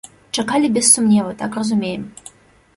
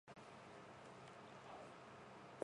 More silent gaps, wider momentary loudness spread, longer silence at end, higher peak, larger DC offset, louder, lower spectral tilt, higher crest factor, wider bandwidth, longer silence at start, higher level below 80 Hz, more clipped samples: neither; first, 14 LU vs 2 LU; first, 0.65 s vs 0 s; first, 0 dBFS vs -30 dBFS; neither; first, -16 LUFS vs -59 LUFS; second, -3.5 dB/octave vs -5 dB/octave; second, 18 dB vs 28 dB; about the same, 11.5 kHz vs 10.5 kHz; first, 0.35 s vs 0.05 s; first, -58 dBFS vs -84 dBFS; neither